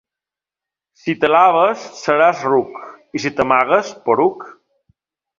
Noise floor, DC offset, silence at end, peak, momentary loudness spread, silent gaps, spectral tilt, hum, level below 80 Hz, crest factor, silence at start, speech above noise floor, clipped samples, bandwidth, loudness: -88 dBFS; under 0.1%; 0.9 s; 0 dBFS; 16 LU; none; -5 dB/octave; none; -58 dBFS; 18 dB; 1.05 s; 72 dB; under 0.1%; 7.6 kHz; -16 LUFS